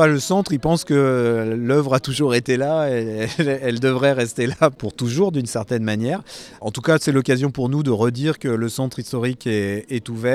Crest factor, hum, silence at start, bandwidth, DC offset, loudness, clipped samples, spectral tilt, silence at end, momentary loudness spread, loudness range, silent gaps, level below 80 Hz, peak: 18 dB; none; 0 s; 15 kHz; under 0.1%; -20 LUFS; under 0.1%; -6 dB/octave; 0 s; 7 LU; 2 LU; none; -52 dBFS; -2 dBFS